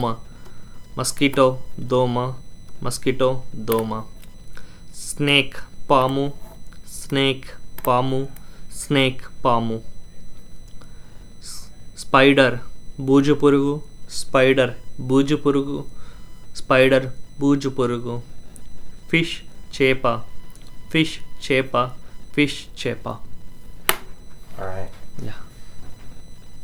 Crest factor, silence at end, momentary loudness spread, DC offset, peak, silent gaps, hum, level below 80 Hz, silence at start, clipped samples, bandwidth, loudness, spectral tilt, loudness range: 22 dB; 0 s; 20 LU; under 0.1%; 0 dBFS; none; none; -40 dBFS; 0 s; under 0.1%; over 20 kHz; -20 LUFS; -5 dB/octave; 7 LU